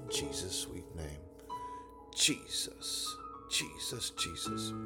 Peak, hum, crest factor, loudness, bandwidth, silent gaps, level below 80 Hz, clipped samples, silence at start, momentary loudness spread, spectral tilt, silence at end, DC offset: -14 dBFS; none; 24 dB; -36 LUFS; 19 kHz; none; -58 dBFS; under 0.1%; 0 s; 16 LU; -2 dB/octave; 0 s; under 0.1%